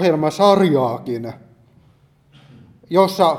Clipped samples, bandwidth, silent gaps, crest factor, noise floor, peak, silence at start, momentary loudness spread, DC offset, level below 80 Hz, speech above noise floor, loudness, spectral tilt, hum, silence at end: under 0.1%; 16 kHz; none; 18 dB; -54 dBFS; 0 dBFS; 0 s; 14 LU; under 0.1%; -62 dBFS; 38 dB; -17 LUFS; -6.5 dB/octave; none; 0 s